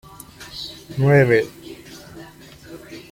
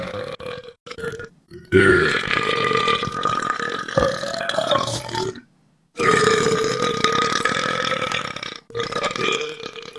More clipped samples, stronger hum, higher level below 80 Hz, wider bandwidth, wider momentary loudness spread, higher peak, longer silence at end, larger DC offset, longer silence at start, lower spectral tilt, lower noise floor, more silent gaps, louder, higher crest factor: neither; neither; about the same, -52 dBFS vs -48 dBFS; first, 16.5 kHz vs 12 kHz; first, 26 LU vs 15 LU; about the same, -2 dBFS vs 0 dBFS; first, 0.15 s vs 0 s; neither; first, 0.4 s vs 0 s; first, -7 dB/octave vs -3.5 dB/octave; second, -42 dBFS vs -60 dBFS; second, none vs 0.80-0.86 s; about the same, -18 LUFS vs -20 LUFS; about the same, 20 dB vs 22 dB